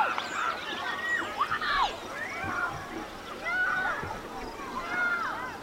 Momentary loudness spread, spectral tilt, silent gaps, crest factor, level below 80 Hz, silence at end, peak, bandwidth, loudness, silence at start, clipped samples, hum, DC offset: 10 LU; -3 dB/octave; none; 18 dB; -54 dBFS; 0 s; -14 dBFS; 16 kHz; -31 LUFS; 0 s; under 0.1%; none; under 0.1%